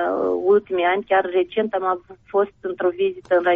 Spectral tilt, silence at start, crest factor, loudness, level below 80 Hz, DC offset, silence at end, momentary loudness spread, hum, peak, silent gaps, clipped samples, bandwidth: -3 dB/octave; 0 s; 14 dB; -21 LUFS; -60 dBFS; under 0.1%; 0 s; 7 LU; none; -6 dBFS; none; under 0.1%; 3.9 kHz